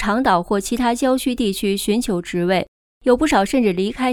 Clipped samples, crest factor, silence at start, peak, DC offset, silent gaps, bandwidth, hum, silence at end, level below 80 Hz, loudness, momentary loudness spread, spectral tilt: under 0.1%; 16 dB; 0 s; -4 dBFS; under 0.1%; 2.68-3.01 s; 18 kHz; none; 0 s; -42 dBFS; -19 LUFS; 5 LU; -5 dB/octave